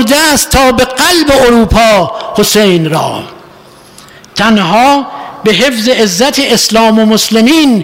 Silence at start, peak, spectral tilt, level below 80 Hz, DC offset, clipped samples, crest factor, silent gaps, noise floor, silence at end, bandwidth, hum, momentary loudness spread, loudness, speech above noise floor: 0 s; 0 dBFS; -3.5 dB/octave; -28 dBFS; under 0.1%; under 0.1%; 8 dB; none; -36 dBFS; 0 s; 16.5 kHz; none; 7 LU; -7 LUFS; 29 dB